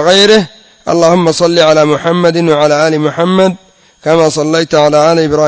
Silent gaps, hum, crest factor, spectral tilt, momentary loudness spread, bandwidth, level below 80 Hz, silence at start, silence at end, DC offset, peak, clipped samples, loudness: none; none; 8 dB; -5 dB/octave; 6 LU; 8 kHz; -46 dBFS; 0 s; 0 s; under 0.1%; 0 dBFS; 0.8%; -9 LUFS